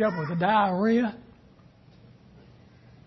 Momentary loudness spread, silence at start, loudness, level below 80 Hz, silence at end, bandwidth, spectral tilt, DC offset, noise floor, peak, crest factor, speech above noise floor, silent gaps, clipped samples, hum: 9 LU; 0 s; -24 LUFS; -62 dBFS; 1.85 s; 6.2 kHz; -8 dB/octave; under 0.1%; -55 dBFS; -10 dBFS; 18 dB; 31 dB; none; under 0.1%; none